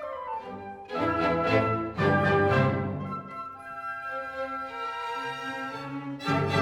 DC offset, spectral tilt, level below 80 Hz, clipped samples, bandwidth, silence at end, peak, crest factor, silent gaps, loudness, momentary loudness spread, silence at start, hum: under 0.1%; -7 dB/octave; -56 dBFS; under 0.1%; 13 kHz; 0 s; -12 dBFS; 18 dB; none; -29 LUFS; 14 LU; 0 s; none